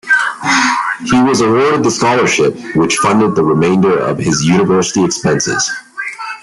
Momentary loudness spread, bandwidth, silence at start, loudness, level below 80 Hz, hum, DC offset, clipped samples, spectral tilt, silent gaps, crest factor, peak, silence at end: 5 LU; 12 kHz; 0.05 s; -12 LUFS; -48 dBFS; none; under 0.1%; under 0.1%; -4.5 dB/octave; none; 12 dB; 0 dBFS; 0.05 s